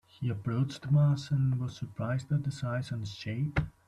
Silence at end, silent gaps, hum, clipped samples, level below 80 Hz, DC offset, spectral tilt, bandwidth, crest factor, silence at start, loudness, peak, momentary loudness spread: 0.2 s; none; none; under 0.1%; -52 dBFS; under 0.1%; -7.5 dB/octave; 9.6 kHz; 14 dB; 0.2 s; -32 LUFS; -16 dBFS; 11 LU